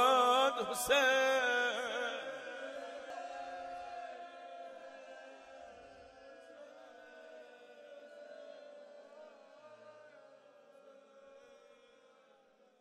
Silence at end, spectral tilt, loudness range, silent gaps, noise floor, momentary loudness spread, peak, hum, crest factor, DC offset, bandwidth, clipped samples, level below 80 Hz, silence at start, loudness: 1.25 s; -1 dB/octave; 24 LU; none; -67 dBFS; 27 LU; -16 dBFS; none; 24 dB; under 0.1%; 15 kHz; under 0.1%; -76 dBFS; 0 s; -34 LUFS